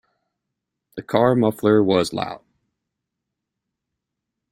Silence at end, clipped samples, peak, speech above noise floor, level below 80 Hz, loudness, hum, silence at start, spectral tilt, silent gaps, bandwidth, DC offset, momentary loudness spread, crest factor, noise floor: 2.15 s; under 0.1%; -2 dBFS; 64 dB; -60 dBFS; -19 LUFS; none; 0.95 s; -6.5 dB/octave; none; 16 kHz; under 0.1%; 21 LU; 20 dB; -82 dBFS